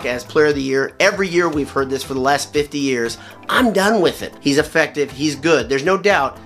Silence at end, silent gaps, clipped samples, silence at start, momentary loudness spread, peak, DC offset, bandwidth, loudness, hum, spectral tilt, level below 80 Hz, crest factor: 0 s; none; under 0.1%; 0 s; 6 LU; 0 dBFS; under 0.1%; 15 kHz; -17 LUFS; none; -4 dB/octave; -46 dBFS; 18 dB